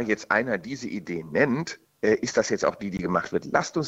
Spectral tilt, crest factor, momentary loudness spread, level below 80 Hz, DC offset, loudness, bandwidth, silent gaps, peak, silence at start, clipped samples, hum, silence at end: -5 dB/octave; 20 dB; 9 LU; -58 dBFS; under 0.1%; -26 LUFS; 8.2 kHz; none; -6 dBFS; 0 s; under 0.1%; none; 0 s